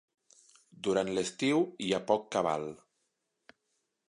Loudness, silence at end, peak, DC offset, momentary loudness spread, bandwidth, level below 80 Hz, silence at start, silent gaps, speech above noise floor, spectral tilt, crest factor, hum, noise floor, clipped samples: -31 LUFS; 1.35 s; -12 dBFS; under 0.1%; 7 LU; 11.5 kHz; -72 dBFS; 0.8 s; none; 50 dB; -4.5 dB/octave; 22 dB; none; -81 dBFS; under 0.1%